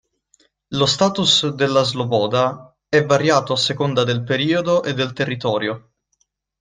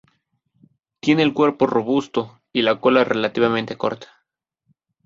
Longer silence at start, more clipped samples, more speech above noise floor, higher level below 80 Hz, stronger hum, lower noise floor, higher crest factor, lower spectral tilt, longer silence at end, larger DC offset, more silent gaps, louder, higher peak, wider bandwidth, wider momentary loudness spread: second, 0.7 s vs 1.05 s; neither; second, 50 dB vs 57 dB; first, -56 dBFS vs -62 dBFS; neither; second, -68 dBFS vs -76 dBFS; about the same, 18 dB vs 20 dB; second, -4.5 dB/octave vs -6 dB/octave; second, 0.8 s vs 1 s; neither; neither; about the same, -18 LUFS vs -20 LUFS; about the same, -2 dBFS vs -2 dBFS; first, 9.8 kHz vs 7.6 kHz; about the same, 7 LU vs 9 LU